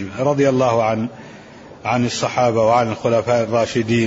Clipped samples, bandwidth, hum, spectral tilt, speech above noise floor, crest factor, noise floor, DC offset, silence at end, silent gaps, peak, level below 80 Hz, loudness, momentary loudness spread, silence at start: under 0.1%; 8 kHz; none; -6 dB/octave; 22 dB; 14 dB; -39 dBFS; under 0.1%; 0 s; none; -4 dBFS; -52 dBFS; -18 LUFS; 8 LU; 0 s